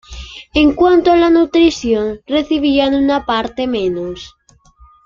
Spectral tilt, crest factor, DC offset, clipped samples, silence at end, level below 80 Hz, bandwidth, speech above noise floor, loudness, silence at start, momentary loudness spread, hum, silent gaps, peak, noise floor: -5 dB/octave; 14 dB; under 0.1%; under 0.1%; 0.8 s; -38 dBFS; 7.4 kHz; 33 dB; -14 LUFS; 0.1 s; 13 LU; none; none; 0 dBFS; -47 dBFS